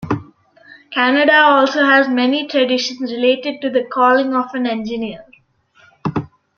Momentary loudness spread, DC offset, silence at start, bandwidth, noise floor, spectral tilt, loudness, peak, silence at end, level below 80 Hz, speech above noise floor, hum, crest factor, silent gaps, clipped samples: 14 LU; under 0.1%; 0 s; 7 kHz; -53 dBFS; -5 dB/octave; -15 LUFS; 0 dBFS; 0.3 s; -56 dBFS; 39 dB; none; 16 dB; none; under 0.1%